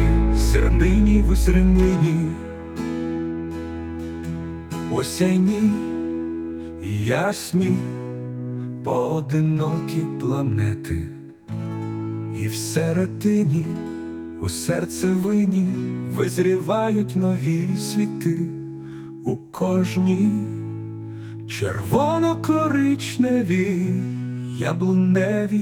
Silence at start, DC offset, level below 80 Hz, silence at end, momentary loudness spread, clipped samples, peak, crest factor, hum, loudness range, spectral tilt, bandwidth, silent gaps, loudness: 0 s; under 0.1%; -30 dBFS; 0 s; 13 LU; under 0.1%; -4 dBFS; 16 dB; none; 4 LU; -7 dB/octave; 18 kHz; none; -22 LUFS